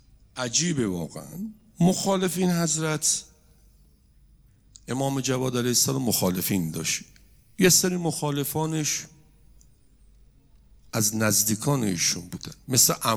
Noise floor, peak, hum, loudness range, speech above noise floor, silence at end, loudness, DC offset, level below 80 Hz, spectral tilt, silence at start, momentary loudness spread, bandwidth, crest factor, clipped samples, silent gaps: -57 dBFS; -8 dBFS; none; 4 LU; 33 dB; 0 s; -24 LUFS; under 0.1%; -58 dBFS; -3.5 dB/octave; 0.35 s; 14 LU; over 20 kHz; 20 dB; under 0.1%; none